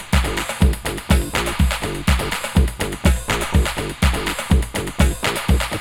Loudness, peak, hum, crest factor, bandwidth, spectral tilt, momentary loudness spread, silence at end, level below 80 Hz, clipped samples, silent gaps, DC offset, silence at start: -20 LUFS; -2 dBFS; none; 16 dB; 17 kHz; -4.5 dB/octave; 3 LU; 0 s; -22 dBFS; under 0.1%; none; under 0.1%; 0 s